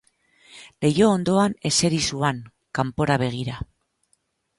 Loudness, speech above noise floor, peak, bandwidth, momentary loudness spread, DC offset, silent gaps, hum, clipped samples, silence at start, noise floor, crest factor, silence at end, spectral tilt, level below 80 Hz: -22 LUFS; 48 dB; -6 dBFS; 11.5 kHz; 13 LU; under 0.1%; none; none; under 0.1%; 0.55 s; -69 dBFS; 18 dB; 0.95 s; -4.5 dB/octave; -50 dBFS